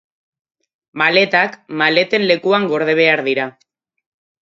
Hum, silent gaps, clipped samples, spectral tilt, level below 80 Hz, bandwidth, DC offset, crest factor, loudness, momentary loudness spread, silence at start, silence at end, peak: none; none; under 0.1%; -5.5 dB/octave; -70 dBFS; 7.6 kHz; under 0.1%; 18 dB; -15 LUFS; 8 LU; 0.95 s; 0.9 s; 0 dBFS